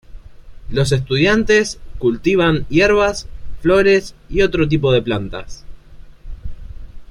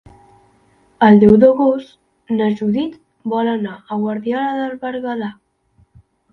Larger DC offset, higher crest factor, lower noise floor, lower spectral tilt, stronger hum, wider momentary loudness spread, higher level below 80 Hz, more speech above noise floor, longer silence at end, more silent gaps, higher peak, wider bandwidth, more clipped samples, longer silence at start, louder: neither; about the same, 16 dB vs 16 dB; second, -38 dBFS vs -57 dBFS; second, -5.5 dB/octave vs -9 dB/octave; neither; first, 18 LU vs 15 LU; first, -32 dBFS vs -50 dBFS; second, 22 dB vs 42 dB; second, 0.05 s vs 1 s; neither; about the same, -2 dBFS vs 0 dBFS; first, 12 kHz vs 4.5 kHz; neither; second, 0.1 s vs 1 s; about the same, -16 LUFS vs -16 LUFS